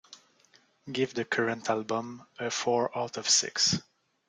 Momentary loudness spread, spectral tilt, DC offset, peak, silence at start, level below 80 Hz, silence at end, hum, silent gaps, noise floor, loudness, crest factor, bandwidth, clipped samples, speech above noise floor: 10 LU; -2 dB/octave; under 0.1%; -12 dBFS; 0.1 s; -72 dBFS; 0.5 s; none; none; -64 dBFS; -28 LUFS; 20 dB; 11 kHz; under 0.1%; 34 dB